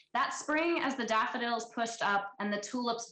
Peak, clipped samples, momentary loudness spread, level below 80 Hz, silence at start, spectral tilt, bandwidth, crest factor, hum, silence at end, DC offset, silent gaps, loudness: -22 dBFS; under 0.1%; 5 LU; -74 dBFS; 0.15 s; -3 dB/octave; 9.2 kHz; 12 dB; none; 0 s; under 0.1%; none; -33 LUFS